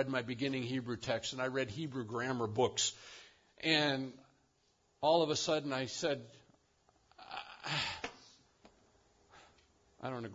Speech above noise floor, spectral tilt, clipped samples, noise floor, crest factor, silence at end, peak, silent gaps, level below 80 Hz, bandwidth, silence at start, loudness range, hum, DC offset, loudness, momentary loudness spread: 39 dB; -3 dB/octave; under 0.1%; -75 dBFS; 22 dB; 0 s; -16 dBFS; none; -72 dBFS; 7.4 kHz; 0 s; 10 LU; none; under 0.1%; -36 LUFS; 16 LU